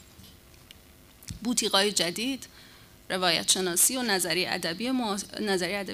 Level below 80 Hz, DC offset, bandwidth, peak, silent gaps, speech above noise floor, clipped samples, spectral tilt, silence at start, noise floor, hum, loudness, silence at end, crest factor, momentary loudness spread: -58 dBFS; under 0.1%; 15.5 kHz; -8 dBFS; none; 27 dB; under 0.1%; -2 dB/octave; 0.2 s; -54 dBFS; none; -26 LUFS; 0 s; 22 dB; 13 LU